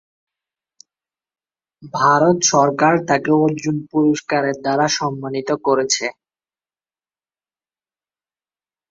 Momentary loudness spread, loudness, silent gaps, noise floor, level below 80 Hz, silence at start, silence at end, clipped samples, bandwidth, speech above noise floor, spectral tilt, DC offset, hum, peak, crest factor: 9 LU; -17 LUFS; none; under -90 dBFS; -62 dBFS; 1.8 s; 2.8 s; under 0.1%; 7.8 kHz; over 73 dB; -4 dB/octave; under 0.1%; none; -2 dBFS; 18 dB